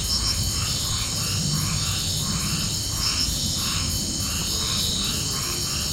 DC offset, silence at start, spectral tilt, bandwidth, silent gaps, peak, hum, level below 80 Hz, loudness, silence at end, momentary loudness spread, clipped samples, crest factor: under 0.1%; 0 s; -2 dB/octave; 17 kHz; none; -10 dBFS; none; -36 dBFS; -23 LUFS; 0 s; 2 LU; under 0.1%; 14 dB